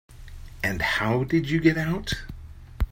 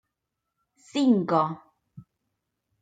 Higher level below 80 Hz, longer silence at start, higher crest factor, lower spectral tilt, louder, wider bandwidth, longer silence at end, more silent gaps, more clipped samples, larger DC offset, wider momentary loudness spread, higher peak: first, -36 dBFS vs -76 dBFS; second, 0.1 s vs 0.95 s; about the same, 20 dB vs 18 dB; about the same, -6 dB/octave vs -7 dB/octave; about the same, -25 LUFS vs -24 LUFS; first, 16.5 kHz vs 9.2 kHz; second, 0 s vs 0.8 s; neither; neither; neither; first, 22 LU vs 12 LU; first, -6 dBFS vs -10 dBFS